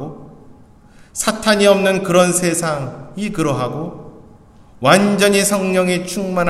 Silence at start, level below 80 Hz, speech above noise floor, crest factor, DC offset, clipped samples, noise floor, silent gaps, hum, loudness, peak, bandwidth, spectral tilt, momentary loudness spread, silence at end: 0 s; -48 dBFS; 29 dB; 16 dB; under 0.1%; under 0.1%; -44 dBFS; none; none; -15 LUFS; 0 dBFS; 15.5 kHz; -4 dB/octave; 15 LU; 0 s